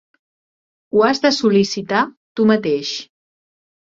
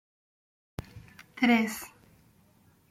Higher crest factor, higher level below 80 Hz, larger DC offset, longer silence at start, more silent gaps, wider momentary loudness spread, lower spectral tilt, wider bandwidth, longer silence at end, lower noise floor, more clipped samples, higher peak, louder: about the same, 18 dB vs 22 dB; about the same, -60 dBFS vs -62 dBFS; neither; about the same, 0.95 s vs 0.95 s; first, 2.17-2.35 s vs none; second, 9 LU vs 26 LU; about the same, -5 dB/octave vs -4.5 dB/octave; second, 7.8 kHz vs 15.5 kHz; second, 0.85 s vs 1.05 s; first, under -90 dBFS vs -63 dBFS; neither; first, -2 dBFS vs -12 dBFS; first, -17 LUFS vs -27 LUFS